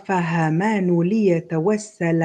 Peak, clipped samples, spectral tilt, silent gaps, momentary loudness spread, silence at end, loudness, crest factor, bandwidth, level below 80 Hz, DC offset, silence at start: -8 dBFS; under 0.1%; -7.5 dB/octave; none; 4 LU; 0 s; -20 LUFS; 12 dB; 9.4 kHz; -64 dBFS; under 0.1%; 0.1 s